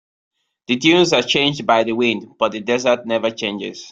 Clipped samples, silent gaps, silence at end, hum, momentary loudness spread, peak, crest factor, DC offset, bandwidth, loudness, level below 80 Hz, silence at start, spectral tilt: under 0.1%; none; 0 s; none; 9 LU; -2 dBFS; 18 dB; under 0.1%; 7.8 kHz; -17 LUFS; -60 dBFS; 0.7 s; -4 dB/octave